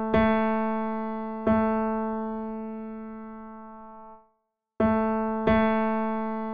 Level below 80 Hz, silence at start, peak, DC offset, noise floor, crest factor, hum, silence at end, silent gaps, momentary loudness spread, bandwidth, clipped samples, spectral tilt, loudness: -48 dBFS; 0 s; -8 dBFS; 0.5%; -75 dBFS; 18 dB; none; 0 s; none; 20 LU; 4.9 kHz; under 0.1%; -9.5 dB/octave; -26 LUFS